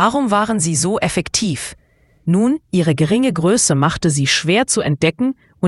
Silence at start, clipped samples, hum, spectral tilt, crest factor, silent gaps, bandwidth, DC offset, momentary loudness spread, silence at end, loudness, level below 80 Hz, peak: 0 s; under 0.1%; none; -4.5 dB/octave; 16 dB; none; 12 kHz; under 0.1%; 8 LU; 0 s; -16 LUFS; -46 dBFS; 0 dBFS